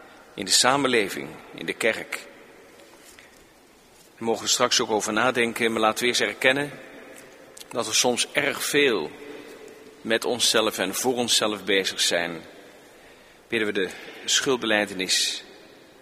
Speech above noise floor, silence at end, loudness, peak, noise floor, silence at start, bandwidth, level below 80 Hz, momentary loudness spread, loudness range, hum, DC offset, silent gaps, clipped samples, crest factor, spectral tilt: 30 dB; 0.45 s; -23 LUFS; -2 dBFS; -54 dBFS; 0 s; 15.5 kHz; -66 dBFS; 17 LU; 4 LU; none; under 0.1%; none; under 0.1%; 24 dB; -1.5 dB/octave